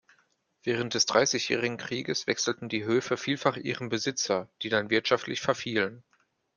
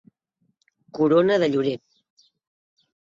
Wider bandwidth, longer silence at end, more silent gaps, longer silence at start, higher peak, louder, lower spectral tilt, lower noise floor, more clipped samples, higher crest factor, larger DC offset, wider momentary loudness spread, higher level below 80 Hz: first, 11 kHz vs 7.6 kHz; second, 0.55 s vs 1.4 s; neither; second, 0.65 s vs 0.95 s; about the same, -6 dBFS vs -6 dBFS; second, -28 LUFS vs -21 LUFS; second, -3 dB/octave vs -7 dB/octave; about the same, -70 dBFS vs -72 dBFS; neither; first, 24 dB vs 18 dB; neither; second, 7 LU vs 17 LU; about the same, -70 dBFS vs -70 dBFS